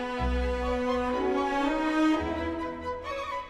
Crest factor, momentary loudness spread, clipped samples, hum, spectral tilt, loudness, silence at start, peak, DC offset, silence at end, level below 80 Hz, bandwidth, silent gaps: 14 dB; 9 LU; under 0.1%; none; -6.5 dB/octave; -29 LUFS; 0 s; -16 dBFS; under 0.1%; 0 s; -38 dBFS; 11 kHz; none